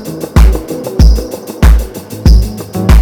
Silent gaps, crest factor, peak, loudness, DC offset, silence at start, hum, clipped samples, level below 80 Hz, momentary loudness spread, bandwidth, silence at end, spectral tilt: none; 8 dB; 0 dBFS; -11 LUFS; under 0.1%; 0 s; none; 5%; -10 dBFS; 9 LU; 17.5 kHz; 0 s; -6.5 dB/octave